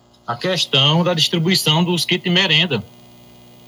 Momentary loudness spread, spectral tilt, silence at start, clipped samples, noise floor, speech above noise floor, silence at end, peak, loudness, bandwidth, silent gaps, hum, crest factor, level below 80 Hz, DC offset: 9 LU; -4 dB/octave; 0.3 s; under 0.1%; -43 dBFS; 27 dB; 0.8 s; -4 dBFS; -16 LUFS; 19.5 kHz; none; 60 Hz at -35 dBFS; 16 dB; -64 dBFS; under 0.1%